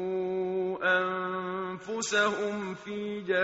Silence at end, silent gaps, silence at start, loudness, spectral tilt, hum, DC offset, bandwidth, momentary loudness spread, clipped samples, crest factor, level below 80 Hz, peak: 0 s; none; 0 s; -30 LUFS; -2.5 dB/octave; none; under 0.1%; 8 kHz; 9 LU; under 0.1%; 16 dB; -72 dBFS; -14 dBFS